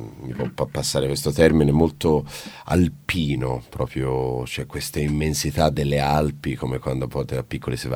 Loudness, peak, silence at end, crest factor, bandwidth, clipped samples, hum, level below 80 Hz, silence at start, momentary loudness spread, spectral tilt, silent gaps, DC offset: -23 LUFS; 0 dBFS; 0 s; 22 dB; 18.5 kHz; under 0.1%; none; -36 dBFS; 0 s; 10 LU; -5.5 dB/octave; none; under 0.1%